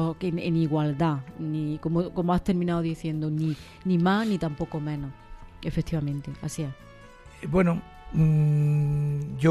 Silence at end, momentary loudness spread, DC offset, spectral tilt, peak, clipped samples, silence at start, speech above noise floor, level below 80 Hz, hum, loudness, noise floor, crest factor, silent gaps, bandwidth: 0 s; 10 LU; under 0.1%; -8 dB/octave; -8 dBFS; under 0.1%; 0 s; 22 dB; -46 dBFS; none; -27 LUFS; -48 dBFS; 18 dB; none; 12 kHz